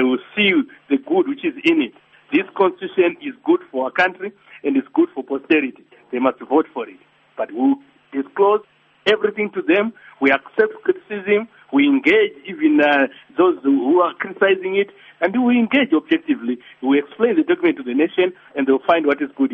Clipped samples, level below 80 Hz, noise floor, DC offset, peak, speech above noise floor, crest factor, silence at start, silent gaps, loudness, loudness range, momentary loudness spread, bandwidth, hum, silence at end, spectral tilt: under 0.1%; -66 dBFS; -46 dBFS; under 0.1%; -2 dBFS; 29 dB; 16 dB; 0 s; none; -19 LUFS; 4 LU; 10 LU; 6.2 kHz; none; 0 s; -2.5 dB/octave